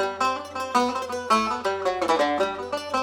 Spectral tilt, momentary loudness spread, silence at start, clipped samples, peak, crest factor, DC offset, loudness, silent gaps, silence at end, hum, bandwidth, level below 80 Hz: -3 dB/octave; 6 LU; 0 s; under 0.1%; -8 dBFS; 16 dB; under 0.1%; -24 LUFS; none; 0 s; none; 17.5 kHz; -62 dBFS